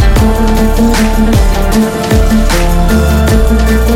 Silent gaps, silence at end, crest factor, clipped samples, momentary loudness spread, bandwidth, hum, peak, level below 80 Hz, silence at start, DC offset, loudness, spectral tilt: none; 0 s; 8 dB; under 0.1%; 2 LU; 16.5 kHz; none; 0 dBFS; -10 dBFS; 0 s; under 0.1%; -10 LUFS; -6 dB/octave